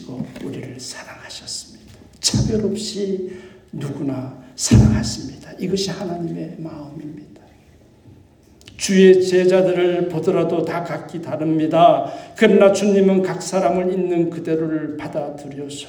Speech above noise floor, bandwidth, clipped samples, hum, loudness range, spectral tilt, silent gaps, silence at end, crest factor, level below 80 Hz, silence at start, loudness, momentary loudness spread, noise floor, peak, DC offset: 31 dB; 18 kHz; under 0.1%; none; 8 LU; -5.5 dB/octave; none; 0 s; 18 dB; -38 dBFS; 0 s; -18 LUFS; 19 LU; -49 dBFS; 0 dBFS; under 0.1%